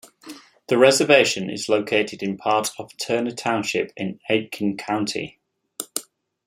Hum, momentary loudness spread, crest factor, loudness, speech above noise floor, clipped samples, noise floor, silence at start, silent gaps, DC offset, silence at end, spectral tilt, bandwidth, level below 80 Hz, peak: none; 19 LU; 22 dB; -22 LUFS; 22 dB; under 0.1%; -43 dBFS; 0.25 s; none; under 0.1%; 0.45 s; -3.5 dB/octave; 16 kHz; -68 dBFS; -2 dBFS